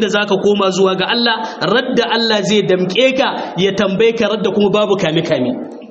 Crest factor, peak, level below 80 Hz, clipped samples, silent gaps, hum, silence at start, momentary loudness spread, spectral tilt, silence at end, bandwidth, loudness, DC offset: 14 dB; 0 dBFS; -54 dBFS; under 0.1%; none; none; 0 s; 4 LU; -3 dB/octave; 0.05 s; 8 kHz; -14 LUFS; under 0.1%